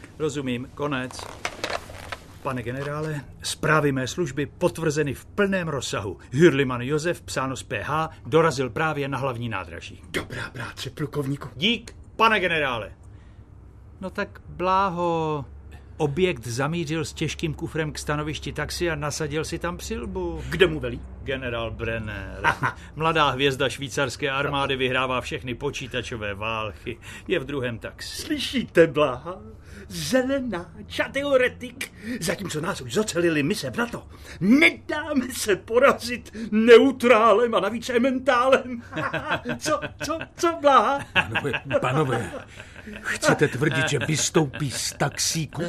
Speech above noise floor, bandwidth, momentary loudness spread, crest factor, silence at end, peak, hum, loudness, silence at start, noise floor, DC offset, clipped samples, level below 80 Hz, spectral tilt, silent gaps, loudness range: 22 dB; 14 kHz; 14 LU; 22 dB; 0 s; -2 dBFS; none; -24 LUFS; 0 s; -46 dBFS; under 0.1%; under 0.1%; -46 dBFS; -4.5 dB/octave; none; 8 LU